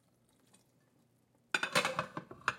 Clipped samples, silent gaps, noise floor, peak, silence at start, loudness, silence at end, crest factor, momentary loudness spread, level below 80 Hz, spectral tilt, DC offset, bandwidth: under 0.1%; none; -72 dBFS; -14 dBFS; 1.55 s; -35 LUFS; 0 s; 26 dB; 9 LU; -78 dBFS; -2 dB/octave; under 0.1%; 16.5 kHz